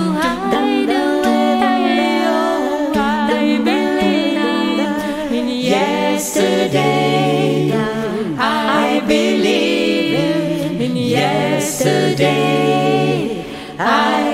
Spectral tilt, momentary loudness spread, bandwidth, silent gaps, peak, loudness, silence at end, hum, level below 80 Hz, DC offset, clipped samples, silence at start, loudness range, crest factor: -5 dB/octave; 5 LU; 16 kHz; none; -2 dBFS; -16 LUFS; 0 s; none; -48 dBFS; under 0.1%; under 0.1%; 0 s; 1 LU; 14 dB